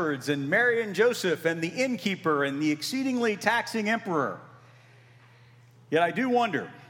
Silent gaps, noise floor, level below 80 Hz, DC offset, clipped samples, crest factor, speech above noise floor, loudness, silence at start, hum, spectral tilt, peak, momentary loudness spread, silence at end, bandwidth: none; -55 dBFS; -82 dBFS; under 0.1%; under 0.1%; 20 dB; 28 dB; -26 LUFS; 0 s; none; -4.5 dB/octave; -8 dBFS; 5 LU; 0.05 s; 18 kHz